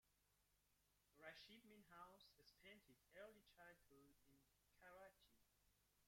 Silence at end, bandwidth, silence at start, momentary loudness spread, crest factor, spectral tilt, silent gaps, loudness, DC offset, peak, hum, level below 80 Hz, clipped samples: 0 s; 16 kHz; 0.05 s; 6 LU; 24 dB; -3.5 dB/octave; none; -66 LUFS; under 0.1%; -46 dBFS; 50 Hz at -90 dBFS; -88 dBFS; under 0.1%